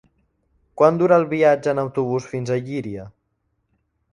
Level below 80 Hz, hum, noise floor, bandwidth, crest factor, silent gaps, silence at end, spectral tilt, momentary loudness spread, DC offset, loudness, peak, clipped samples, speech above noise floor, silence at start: -58 dBFS; none; -71 dBFS; 10.5 kHz; 20 dB; none; 1.05 s; -7.5 dB/octave; 13 LU; under 0.1%; -19 LUFS; 0 dBFS; under 0.1%; 52 dB; 0.75 s